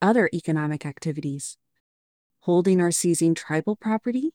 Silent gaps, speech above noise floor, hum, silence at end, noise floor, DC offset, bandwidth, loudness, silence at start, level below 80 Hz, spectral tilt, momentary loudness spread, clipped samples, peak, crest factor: 1.80-2.30 s; over 67 dB; none; 0.05 s; under -90 dBFS; under 0.1%; 17.5 kHz; -24 LUFS; 0 s; -70 dBFS; -5.5 dB/octave; 11 LU; under 0.1%; -6 dBFS; 16 dB